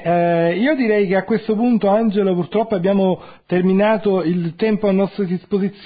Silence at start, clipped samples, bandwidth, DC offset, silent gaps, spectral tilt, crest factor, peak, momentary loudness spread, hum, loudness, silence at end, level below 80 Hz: 0 s; under 0.1%; 4.9 kHz; under 0.1%; none; -12.5 dB/octave; 12 dB; -4 dBFS; 5 LU; none; -17 LUFS; 0 s; -56 dBFS